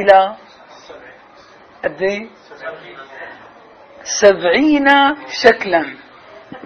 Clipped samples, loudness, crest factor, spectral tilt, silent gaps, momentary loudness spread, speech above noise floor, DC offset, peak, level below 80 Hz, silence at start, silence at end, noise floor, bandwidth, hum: 0.2%; -14 LUFS; 16 dB; -3 dB/octave; none; 23 LU; 29 dB; under 0.1%; 0 dBFS; -54 dBFS; 0 s; 0.05 s; -44 dBFS; 8.2 kHz; none